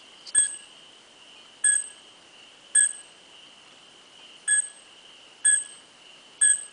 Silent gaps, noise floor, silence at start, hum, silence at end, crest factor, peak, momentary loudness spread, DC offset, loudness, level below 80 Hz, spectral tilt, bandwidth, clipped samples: none; -52 dBFS; 0.25 s; none; 0.05 s; 22 dB; -8 dBFS; 18 LU; under 0.1%; -22 LUFS; -78 dBFS; 4 dB/octave; 10 kHz; under 0.1%